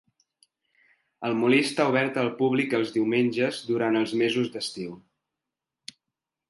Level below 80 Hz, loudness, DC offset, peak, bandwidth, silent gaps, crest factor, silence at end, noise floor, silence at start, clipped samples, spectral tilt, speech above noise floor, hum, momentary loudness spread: -74 dBFS; -25 LUFS; under 0.1%; -8 dBFS; 11.5 kHz; none; 18 dB; 1.5 s; -87 dBFS; 1.2 s; under 0.1%; -5.5 dB/octave; 62 dB; none; 16 LU